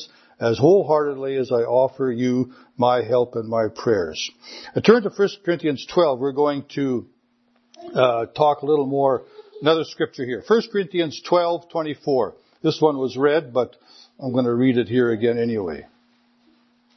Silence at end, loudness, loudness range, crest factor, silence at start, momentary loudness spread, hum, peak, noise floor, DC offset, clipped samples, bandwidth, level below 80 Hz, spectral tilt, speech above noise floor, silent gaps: 1.15 s; -21 LUFS; 2 LU; 20 dB; 0 s; 9 LU; none; 0 dBFS; -63 dBFS; under 0.1%; under 0.1%; 6.4 kHz; -64 dBFS; -6.5 dB/octave; 43 dB; none